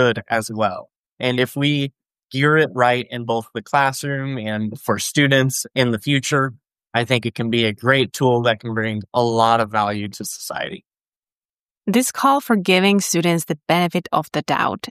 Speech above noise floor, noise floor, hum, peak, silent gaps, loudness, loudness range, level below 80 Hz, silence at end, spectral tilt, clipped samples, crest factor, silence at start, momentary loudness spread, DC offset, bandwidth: over 71 dB; under -90 dBFS; none; -2 dBFS; 0.96-1.17 s, 2.23-2.28 s, 11.16-11.20 s, 11.37-11.69 s; -19 LUFS; 3 LU; -60 dBFS; 0 s; -4.5 dB/octave; under 0.1%; 18 dB; 0 s; 9 LU; under 0.1%; 15 kHz